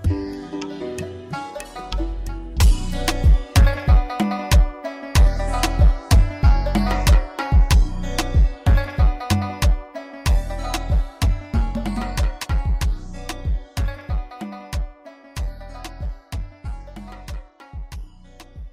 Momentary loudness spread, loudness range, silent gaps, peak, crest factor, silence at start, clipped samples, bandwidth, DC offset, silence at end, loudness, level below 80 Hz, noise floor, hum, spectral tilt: 17 LU; 13 LU; none; -6 dBFS; 14 dB; 0 s; under 0.1%; 16 kHz; under 0.1%; 0 s; -22 LUFS; -20 dBFS; -43 dBFS; none; -5.5 dB/octave